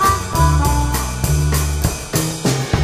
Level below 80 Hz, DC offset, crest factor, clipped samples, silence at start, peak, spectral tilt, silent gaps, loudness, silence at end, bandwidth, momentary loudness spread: -22 dBFS; under 0.1%; 16 dB; under 0.1%; 0 s; -2 dBFS; -4.5 dB/octave; none; -18 LUFS; 0 s; 16 kHz; 5 LU